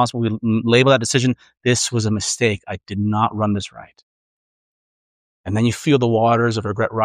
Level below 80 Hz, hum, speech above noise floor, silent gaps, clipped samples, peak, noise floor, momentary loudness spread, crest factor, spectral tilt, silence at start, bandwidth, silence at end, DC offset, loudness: -54 dBFS; none; over 72 dB; 4.03-5.44 s; under 0.1%; -2 dBFS; under -90 dBFS; 10 LU; 18 dB; -5 dB/octave; 0 s; 15 kHz; 0 s; under 0.1%; -18 LUFS